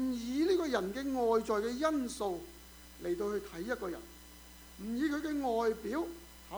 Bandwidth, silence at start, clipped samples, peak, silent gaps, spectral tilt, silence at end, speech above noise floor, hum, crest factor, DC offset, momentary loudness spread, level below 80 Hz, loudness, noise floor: over 20 kHz; 0 s; under 0.1%; -18 dBFS; none; -4.5 dB/octave; 0 s; 19 dB; none; 18 dB; under 0.1%; 21 LU; -58 dBFS; -35 LUFS; -54 dBFS